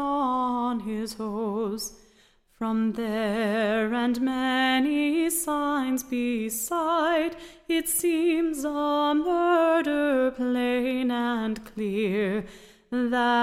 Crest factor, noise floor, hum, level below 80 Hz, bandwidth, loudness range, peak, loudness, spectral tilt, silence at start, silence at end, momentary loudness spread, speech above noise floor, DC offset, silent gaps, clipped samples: 12 dB; -61 dBFS; none; -56 dBFS; 16 kHz; 4 LU; -12 dBFS; -26 LUFS; -4 dB/octave; 0 s; 0 s; 9 LU; 35 dB; under 0.1%; none; under 0.1%